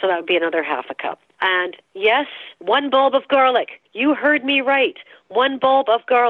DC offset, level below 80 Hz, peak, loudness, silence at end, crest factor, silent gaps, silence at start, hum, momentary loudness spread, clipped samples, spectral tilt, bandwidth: under 0.1%; -70 dBFS; -4 dBFS; -18 LUFS; 0 s; 14 dB; none; 0 s; none; 12 LU; under 0.1%; -5.5 dB/octave; 4.4 kHz